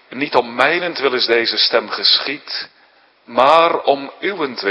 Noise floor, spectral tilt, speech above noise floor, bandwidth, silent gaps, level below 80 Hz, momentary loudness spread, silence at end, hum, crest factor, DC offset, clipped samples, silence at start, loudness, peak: -52 dBFS; -4 dB/octave; 36 dB; 11 kHz; none; -66 dBFS; 11 LU; 0 s; none; 16 dB; under 0.1%; under 0.1%; 0.1 s; -15 LUFS; 0 dBFS